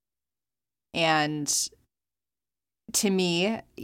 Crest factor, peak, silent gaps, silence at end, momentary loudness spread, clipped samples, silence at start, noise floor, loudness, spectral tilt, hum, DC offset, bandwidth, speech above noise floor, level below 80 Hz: 20 dB; -10 dBFS; none; 0 s; 6 LU; under 0.1%; 0.95 s; under -90 dBFS; -26 LUFS; -3 dB/octave; none; under 0.1%; 16.5 kHz; over 64 dB; -68 dBFS